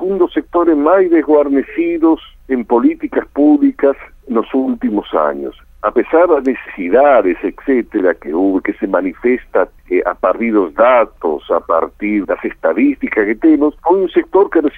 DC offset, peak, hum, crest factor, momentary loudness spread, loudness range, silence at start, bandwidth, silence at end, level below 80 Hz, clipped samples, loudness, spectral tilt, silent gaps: under 0.1%; 0 dBFS; none; 12 dB; 8 LU; 2 LU; 0 s; 3.8 kHz; 0 s; -44 dBFS; under 0.1%; -14 LUFS; -8.5 dB/octave; none